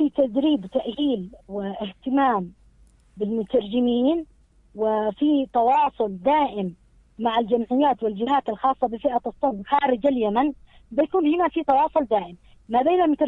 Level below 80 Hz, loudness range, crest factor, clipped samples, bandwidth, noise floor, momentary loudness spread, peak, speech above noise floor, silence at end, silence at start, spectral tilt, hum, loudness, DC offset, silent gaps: -54 dBFS; 3 LU; 16 dB; under 0.1%; 4.1 kHz; -55 dBFS; 9 LU; -6 dBFS; 33 dB; 0 s; 0 s; -8 dB/octave; none; -23 LUFS; under 0.1%; none